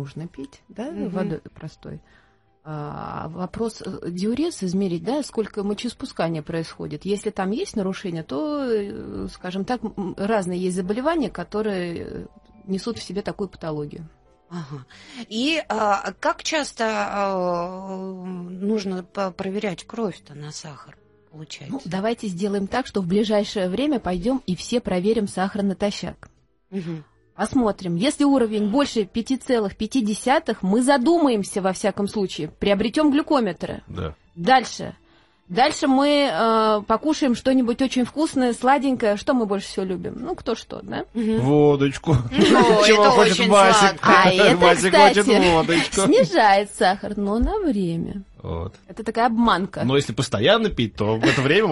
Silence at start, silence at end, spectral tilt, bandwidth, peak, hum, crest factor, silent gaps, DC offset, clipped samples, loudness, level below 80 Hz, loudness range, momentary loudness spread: 0 s; 0 s; -5 dB/octave; 11.5 kHz; 0 dBFS; none; 20 dB; none; under 0.1%; under 0.1%; -21 LUFS; -46 dBFS; 14 LU; 17 LU